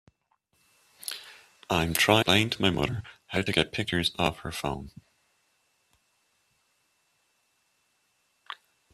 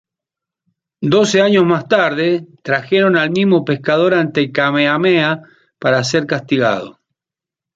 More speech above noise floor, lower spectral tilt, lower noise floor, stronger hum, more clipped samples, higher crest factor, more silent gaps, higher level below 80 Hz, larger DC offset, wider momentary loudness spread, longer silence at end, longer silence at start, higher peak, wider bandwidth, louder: second, 46 dB vs 73 dB; second, -4 dB/octave vs -5.5 dB/octave; second, -73 dBFS vs -87 dBFS; neither; neither; first, 26 dB vs 14 dB; neither; first, -54 dBFS vs -60 dBFS; neither; first, 23 LU vs 8 LU; second, 0.4 s vs 0.85 s; about the same, 1.05 s vs 1 s; about the same, -4 dBFS vs -2 dBFS; first, 15.5 kHz vs 7.8 kHz; second, -27 LUFS vs -15 LUFS